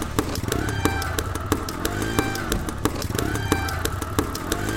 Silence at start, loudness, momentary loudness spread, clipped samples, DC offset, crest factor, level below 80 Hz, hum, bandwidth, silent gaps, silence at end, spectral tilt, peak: 0 s; -25 LUFS; 3 LU; under 0.1%; under 0.1%; 22 dB; -34 dBFS; none; 17 kHz; none; 0 s; -4.5 dB/octave; -2 dBFS